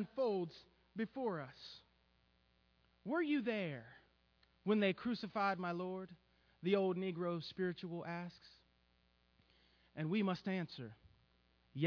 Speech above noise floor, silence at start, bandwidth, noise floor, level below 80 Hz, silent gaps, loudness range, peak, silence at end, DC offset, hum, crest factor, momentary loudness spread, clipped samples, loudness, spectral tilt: 36 dB; 0 s; 5.4 kHz; -75 dBFS; -78 dBFS; none; 6 LU; -22 dBFS; 0 s; under 0.1%; none; 20 dB; 18 LU; under 0.1%; -40 LUFS; -5 dB/octave